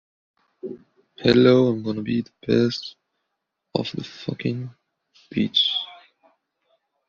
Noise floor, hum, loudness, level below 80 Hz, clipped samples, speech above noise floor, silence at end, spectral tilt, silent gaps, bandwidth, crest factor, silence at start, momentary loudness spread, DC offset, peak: -79 dBFS; none; -22 LUFS; -58 dBFS; under 0.1%; 58 dB; 1.15 s; -4.5 dB/octave; none; 7.2 kHz; 22 dB; 0.65 s; 21 LU; under 0.1%; -4 dBFS